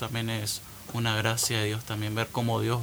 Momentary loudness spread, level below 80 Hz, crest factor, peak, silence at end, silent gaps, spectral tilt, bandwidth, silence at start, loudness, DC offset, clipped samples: 7 LU; -56 dBFS; 20 dB; -10 dBFS; 0 s; none; -4 dB/octave; over 20 kHz; 0 s; -29 LUFS; under 0.1%; under 0.1%